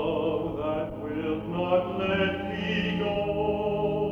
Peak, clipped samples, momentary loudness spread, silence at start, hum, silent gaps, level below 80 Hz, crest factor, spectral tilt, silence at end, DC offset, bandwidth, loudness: -12 dBFS; under 0.1%; 5 LU; 0 s; none; none; -48 dBFS; 16 dB; -7.5 dB/octave; 0 s; under 0.1%; 7 kHz; -28 LUFS